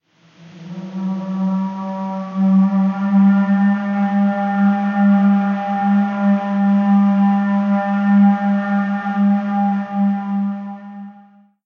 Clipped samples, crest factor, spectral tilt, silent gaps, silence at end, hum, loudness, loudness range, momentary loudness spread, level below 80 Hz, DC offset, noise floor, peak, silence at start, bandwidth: under 0.1%; 12 dB; -9.5 dB/octave; none; 0.55 s; none; -17 LUFS; 3 LU; 11 LU; -72 dBFS; under 0.1%; -47 dBFS; -4 dBFS; 0.4 s; 4.1 kHz